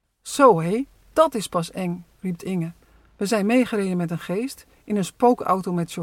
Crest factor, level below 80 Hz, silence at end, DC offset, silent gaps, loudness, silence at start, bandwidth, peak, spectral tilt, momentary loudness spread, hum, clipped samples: 20 dB; -58 dBFS; 0 s; under 0.1%; none; -23 LUFS; 0.25 s; 17 kHz; -2 dBFS; -6 dB/octave; 14 LU; none; under 0.1%